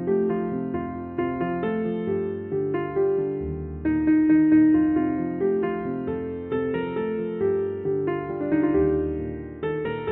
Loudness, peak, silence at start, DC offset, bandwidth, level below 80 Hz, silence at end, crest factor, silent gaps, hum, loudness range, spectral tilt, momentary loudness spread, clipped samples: -24 LUFS; -10 dBFS; 0 s; under 0.1%; 3.8 kHz; -46 dBFS; 0 s; 14 dB; none; none; 5 LU; -8 dB/octave; 11 LU; under 0.1%